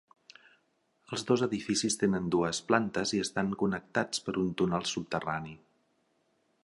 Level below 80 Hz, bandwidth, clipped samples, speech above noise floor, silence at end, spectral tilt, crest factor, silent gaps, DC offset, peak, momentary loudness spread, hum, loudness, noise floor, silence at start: -62 dBFS; 11.5 kHz; under 0.1%; 43 dB; 1.1 s; -4.5 dB/octave; 24 dB; none; under 0.1%; -8 dBFS; 7 LU; none; -31 LUFS; -73 dBFS; 1.1 s